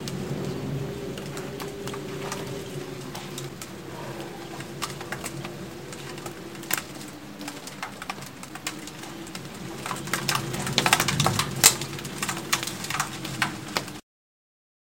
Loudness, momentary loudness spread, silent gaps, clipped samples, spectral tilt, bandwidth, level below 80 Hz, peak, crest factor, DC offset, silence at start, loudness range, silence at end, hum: -28 LUFS; 17 LU; none; under 0.1%; -2.5 dB/octave; 17 kHz; -54 dBFS; 0 dBFS; 30 dB; 0.2%; 0 s; 12 LU; 0.95 s; none